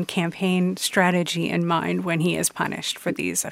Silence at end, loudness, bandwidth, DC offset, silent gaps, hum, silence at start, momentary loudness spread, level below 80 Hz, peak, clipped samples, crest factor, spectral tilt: 0 s; -23 LUFS; 16.5 kHz; under 0.1%; none; none; 0 s; 6 LU; -62 dBFS; -4 dBFS; under 0.1%; 18 dB; -4 dB/octave